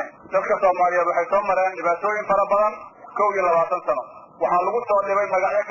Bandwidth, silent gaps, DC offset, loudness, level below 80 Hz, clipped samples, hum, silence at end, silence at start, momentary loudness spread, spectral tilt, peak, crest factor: 7.2 kHz; none; under 0.1%; -21 LUFS; -60 dBFS; under 0.1%; none; 0 s; 0 s; 7 LU; -5.5 dB/octave; -6 dBFS; 14 dB